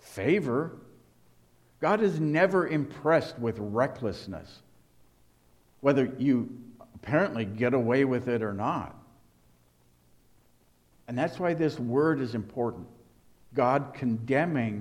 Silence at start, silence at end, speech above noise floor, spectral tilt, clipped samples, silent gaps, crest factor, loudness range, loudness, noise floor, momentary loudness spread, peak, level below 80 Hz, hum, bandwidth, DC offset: 0.05 s; 0 s; 36 dB; -7.5 dB/octave; under 0.1%; none; 18 dB; 5 LU; -28 LUFS; -64 dBFS; 10 LU; -10 dBFS; -64 dBFS; none; 13.5 kHz; under 0.1%